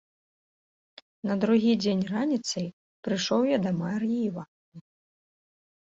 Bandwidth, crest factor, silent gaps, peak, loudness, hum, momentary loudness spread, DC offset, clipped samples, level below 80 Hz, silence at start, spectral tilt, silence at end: 7.8 kHz; 16 dB; 2.73-3.03 s, 4.48-4.72 s; -12 dBFS; -27 LUFS; none; 14 LU; under 0.1%; under 0.1%; -68 dBFS; 1.25 s; -5.5 dB/octave; 1.15 s